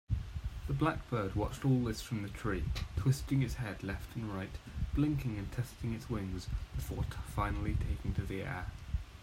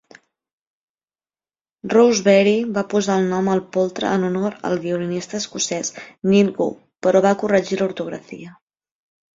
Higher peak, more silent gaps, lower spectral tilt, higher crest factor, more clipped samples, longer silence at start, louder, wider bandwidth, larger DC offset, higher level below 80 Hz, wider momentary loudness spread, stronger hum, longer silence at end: second, -18 dBFS vs -2 dBFS; neither; first, -7 dB/octave vs -5 dB/octave; about the same, 18 dB vs 18 dB; neither; second, 0.1 s vs 1.85 s; second, -37 LUFS vs -19 LUFS; first, 16 kHz vs 7.8 kHz; neither; first, -44 dBFS vs -62 dBFS; second, 8 LU vs 12 LU; neither; second, 0 s vs 0.85 s